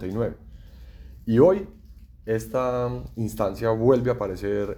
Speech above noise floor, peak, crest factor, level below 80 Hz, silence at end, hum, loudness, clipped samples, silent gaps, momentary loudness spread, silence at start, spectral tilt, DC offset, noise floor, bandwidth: 21 dB; -4 dBFS; 20 dB; -44 dBFS; 0 s; none; -24 LUFS; under 0.1%; none; 15 LU; 0 s; -8 dB/octave; under 0.1%; -44 dBFS; 19.5 kHz